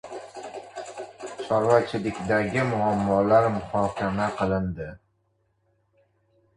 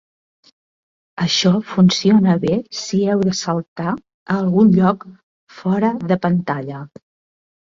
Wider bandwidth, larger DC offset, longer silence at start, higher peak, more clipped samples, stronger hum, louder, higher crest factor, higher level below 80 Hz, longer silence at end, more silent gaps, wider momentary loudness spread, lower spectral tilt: first, 11 kHz vs 7.6 kHz; neither; second, 0.05 s vs 1.15 s; second, -6 dBFS vs -2 dBFS; neither; neither; second, -24 LUFS vs -17 LUFS; about the same, 20 dB vs 16 dB; first, -50 dBFS vs -56 dBFS; first, 1.6 s vs 0.85 s; second, none vs 3.68-3.76 s, 4.14-4.26 s, 5.23-5.47 s; first, 18 LU vs 13 LU; about the same, -7 dB/octave vs -6 dB/octave